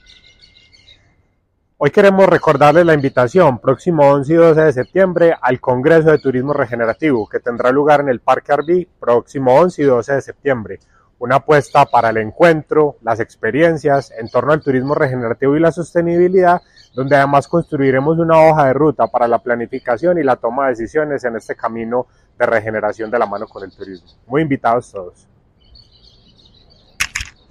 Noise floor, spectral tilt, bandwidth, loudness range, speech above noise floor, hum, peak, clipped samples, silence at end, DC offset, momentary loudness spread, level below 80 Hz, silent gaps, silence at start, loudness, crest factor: -62 dBFS; -7 dB/octave; 13.5 kHz; 8 LU; 49 dB; none; 0 dBFS; under 0.1%; 0.25 s; under 0.1%; 11 LU; -48 dBFS; none; 1.8 s; -14 LUFS; 14 dB